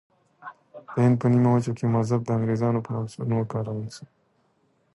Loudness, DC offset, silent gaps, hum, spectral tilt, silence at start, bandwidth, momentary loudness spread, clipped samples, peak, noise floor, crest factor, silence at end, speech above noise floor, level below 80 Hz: -24 LUFS; under 0.1%; none; none; -8.5 dB/octave; 0.45 s; 11.5 kHz; 23 LU; under 0.1%; -10 dBFS; -67 dBFS; 14 dB; 0.9 s; 44 dB; -60 dBFS